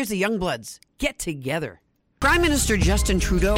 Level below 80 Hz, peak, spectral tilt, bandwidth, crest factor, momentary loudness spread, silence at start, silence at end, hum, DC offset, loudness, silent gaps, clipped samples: -28 dBFS; -8 dBFS; -4.5 dB/octave; 16 kHz; 14 dB; 11 LU; 0 s; 0 s; none; under 0.1%; -22 LUFS; none; under 0.1%